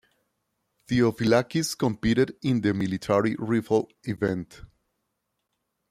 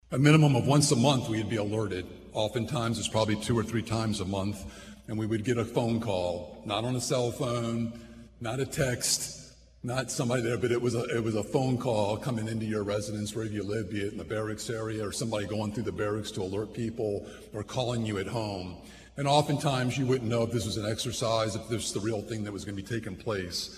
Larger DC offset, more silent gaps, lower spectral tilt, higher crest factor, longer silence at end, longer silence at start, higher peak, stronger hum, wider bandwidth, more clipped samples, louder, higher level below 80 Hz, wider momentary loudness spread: neither; neither; about the same, -6 dB/octave vs -5 dB/octave; about the same, 18 dB vs 22 dB; first, 1.3 s vs 0 s; first, 0.9 s vs 0.1 s; about the same, -8 dBFS vs -8 dBFS; neither; first, 15.5 kHz vs 14 kHz; neither; first, -25 LUFS vs -30 LUFS; about the same, -54 dBFS vs -56 dBFS; second, 6 LU vs 10 LU